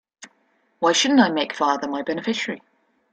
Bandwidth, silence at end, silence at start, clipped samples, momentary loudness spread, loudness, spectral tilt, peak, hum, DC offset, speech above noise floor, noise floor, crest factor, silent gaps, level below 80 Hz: 9.2 kHz; 0.55 s; 0.2 s; under 0.1%; 10 LU; -21 LUFS; -3 dB/octave; -2 dBFS; none; under 0.1%; 44 dB; -65 dBFS; 20 dB; none; -68 dBFS